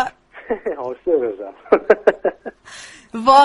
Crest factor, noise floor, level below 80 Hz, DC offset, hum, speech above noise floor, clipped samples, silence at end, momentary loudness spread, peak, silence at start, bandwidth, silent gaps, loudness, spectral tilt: 18 dB; -40 dBFS; -54 dBFS; under 0.1%; none; 25 dB; under 0.1%; 0 s; 21 LU; 0 dBFS; 0 s; 11.5 kHz; none; -19 LUFS; -4 dB/octave